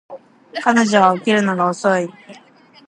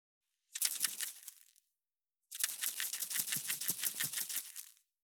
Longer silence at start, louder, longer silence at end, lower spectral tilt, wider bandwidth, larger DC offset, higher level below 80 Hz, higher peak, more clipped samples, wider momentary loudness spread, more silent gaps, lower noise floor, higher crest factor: second, 0.1 s vs 0.55 s; first, -16 LUFS vs -36 LUFS; about the same, 0.55 s vs 0.45 s; first, -5 dB/octave vs 1.5 dB/octave; second, 10.5 kHz vs over 20 kHz; neither; first, -68 dBFS vs under -90 dBFS; first, 0 dBFS vs -12 dBFS; neither; second, 9 LU vs 16 LU; neither; second, -48 dBFS vs under -90 dBFS; second, 18 dB vs 30 dB